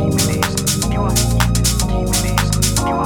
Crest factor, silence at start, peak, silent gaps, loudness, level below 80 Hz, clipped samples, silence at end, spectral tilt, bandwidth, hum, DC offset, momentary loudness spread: 16 dB; 0 s; 0 dBFS; none; -16 LUFS; -22 dBFS; under 0.1%; 0 s; -4 dB/octave; over 20 kHz; none; under 0.1%; 2 LU